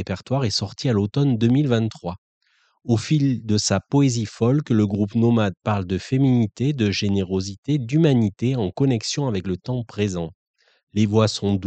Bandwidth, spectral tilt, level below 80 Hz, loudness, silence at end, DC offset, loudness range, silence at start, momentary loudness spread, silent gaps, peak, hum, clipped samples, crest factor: 9 kHz; -6 dB/octave; -54 dBFS; -21 LUFS; 0 s; under 0.1%; 2 LU; 0 s; 8 LU; 2.18-2.41 s, 7.58-7.63 s, 10.35-10.54 s, 10.83-10.87 s; -6 dBFS; none; under 0.1%; 16 dB